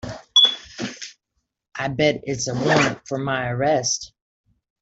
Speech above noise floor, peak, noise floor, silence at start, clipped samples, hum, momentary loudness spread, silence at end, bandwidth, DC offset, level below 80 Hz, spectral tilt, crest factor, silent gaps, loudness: 55 dB; -4 dBFS; -76 dBFS; 0.05 s; under 0.1%; none; 19 LU; 0.75 s; 8.2 kHz; under 0.1%; -54 dBFS; -3 dB/octave; 18 dB; none; -20 LUFS